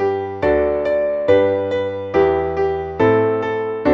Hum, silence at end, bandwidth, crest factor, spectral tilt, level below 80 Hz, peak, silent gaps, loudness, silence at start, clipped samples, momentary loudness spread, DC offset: none; 0 s; 6.8 kHz; 14 dB; -8 dB/octave; -42 dBFS; -2 dBFS; none; -18 LUFS; 0 s; under 0.1%; 6 LU; under 0.1%